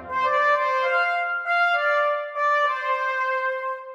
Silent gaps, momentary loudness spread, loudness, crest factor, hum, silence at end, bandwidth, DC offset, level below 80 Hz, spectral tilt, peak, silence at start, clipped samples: none; 5 LU; -22 LUFS; 12 dB; none; 0 s; 8.8 kHz; under 0.1%; -68 dBFS; -1.5 dB/octave; -10 dBFS; 0 s; under 0.1%